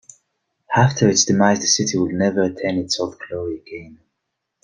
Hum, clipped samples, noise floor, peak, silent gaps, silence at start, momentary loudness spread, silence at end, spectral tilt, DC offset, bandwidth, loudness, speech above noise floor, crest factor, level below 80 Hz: none; under 0.1%; -78 dBFS; -2 dBFS; none; 0.7 s; 14 LU; 0.7 s; -4 dB/octave; under 0.1%; 11 kHz; -18 LUFS; 59 dB; 18 dB; -54 dBFS